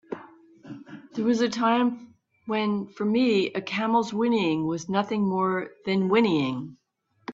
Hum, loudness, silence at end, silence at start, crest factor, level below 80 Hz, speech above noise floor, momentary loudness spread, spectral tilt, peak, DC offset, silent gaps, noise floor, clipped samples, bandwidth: none; -25 LUFS; 0 s; 0.1 s; 18 dB; -68 dBFS; 25 dB; 20 LU; -6 dB/octave; -8 dBFS; under 0.1%; none; -49 dBFS; under 0.1%; 7.8 kHz